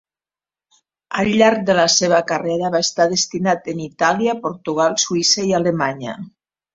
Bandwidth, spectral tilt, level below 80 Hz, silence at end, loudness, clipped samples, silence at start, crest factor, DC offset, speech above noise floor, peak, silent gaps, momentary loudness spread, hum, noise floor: 8 kHz; -3 dB/octave; -56 dBFS; 0.45 s; -17 LUFS; under 0.1%; 1.1 s; 18 dB; under 0.1%; over 72 dB; -2 dBFS; none; 10 LU; none; under -90 dBFS